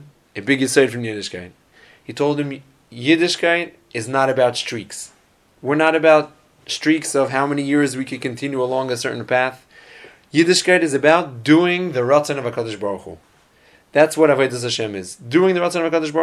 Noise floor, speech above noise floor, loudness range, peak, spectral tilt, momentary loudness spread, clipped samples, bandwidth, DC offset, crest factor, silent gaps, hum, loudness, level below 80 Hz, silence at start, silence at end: -53 dBFS; 35 dB; 4 LU; 0 dBFS; -4.5 dB/octave; 14 LU; under 0.1%; 14.5 kHz; under 0.1%; 18 dB; none; none; -18 LUFS; -62 dBFS; 0 s; 0 s